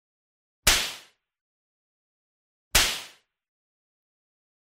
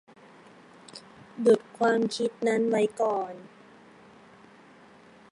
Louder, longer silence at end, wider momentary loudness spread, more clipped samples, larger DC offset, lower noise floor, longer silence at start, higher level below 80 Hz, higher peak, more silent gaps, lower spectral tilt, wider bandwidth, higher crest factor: first, -23 LUFS vs -26 LUFS; second, 1.55 s vs 1.85 s; second, 13 LU vs 23 LU; neither; neither; second, -48 dBFS vs -54 dBFS; second, 0.65 s vs 0.95 s; first, -42 dBFS vs -78 dBFS; first, -6 dBFS vs -10 dBFS; first, 1.41-2.71 s vs none; second, 0 dB/octave vs -5 dB/octave; first, 16 kHz vs 11.5 kHz; first, 26 dB vs 20 dB